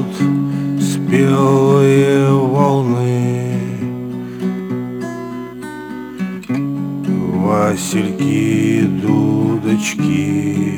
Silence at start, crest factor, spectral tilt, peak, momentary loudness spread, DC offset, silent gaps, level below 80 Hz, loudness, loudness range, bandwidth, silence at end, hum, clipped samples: 0 s; 14 dB; -7 dB/octave; 0 dBFS; 13 LU; under 0.1%; none; -54 dBFS; -16 LUFS; 10 LU; over 20 kHz; 0 s; none; under 0.1%